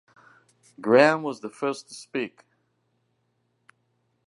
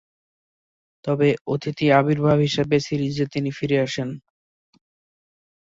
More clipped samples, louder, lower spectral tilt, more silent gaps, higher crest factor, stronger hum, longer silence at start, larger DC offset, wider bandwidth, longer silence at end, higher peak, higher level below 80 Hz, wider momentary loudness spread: neither; second, -24 LUFS vs -21 LUFS; second, -5 dB/octave vs -6.5 dB/octave; second, none vs 1.41-1.45 s; first, 26 dB vs 20 dB; neither; second, 0.8 s vs 1.05 s; neither; first, 11.5 kHz vs 7.8 kHz; first, 2 s vs 1.5 s; about the same, -2 dBFS vs -4 dBFS; second, -82 dBFS vs -56 dBFS; first, 17 LU vs 10 LU